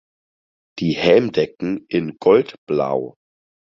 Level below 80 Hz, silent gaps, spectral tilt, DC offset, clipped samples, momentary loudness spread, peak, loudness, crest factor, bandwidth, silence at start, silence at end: -56 dBFS; 2.58-2.67 s; -7 dB/octave; under 0.1%; under 0.1%; 11 LU; -2 dBFS; -19 LUFS; 18 dB; 7 kHz; 0.75 s; 0.7 s